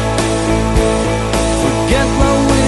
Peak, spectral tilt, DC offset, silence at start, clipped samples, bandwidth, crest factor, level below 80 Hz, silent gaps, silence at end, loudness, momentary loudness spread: 0 dBFS; -5 dB/octave; under 0.1%; 0 s; under 0.1%; 12 kHz; 12 dB; -20 dBFS; none; 0 s; -14 LUFS; 3 LU